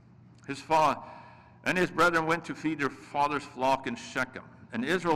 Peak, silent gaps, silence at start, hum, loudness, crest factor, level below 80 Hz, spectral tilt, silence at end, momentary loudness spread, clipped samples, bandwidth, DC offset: -14 dBFS; none; 0.5 s; none; -29 LUFS; 14 dB; -62 dBFS; -5 dB/octave; 0 s; 16 LU; under 0.1%; 16 kHz; under 0.1%